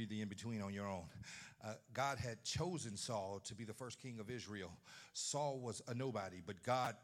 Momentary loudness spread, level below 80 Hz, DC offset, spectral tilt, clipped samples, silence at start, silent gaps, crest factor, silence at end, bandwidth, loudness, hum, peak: 11 LU; -76 dBFS; under 0.1%; -4 dB/octave; under 0.1%; 0 s; none; 22 dB; 0 s; 16 kHz; -46 LUFS; none; -24 dBFS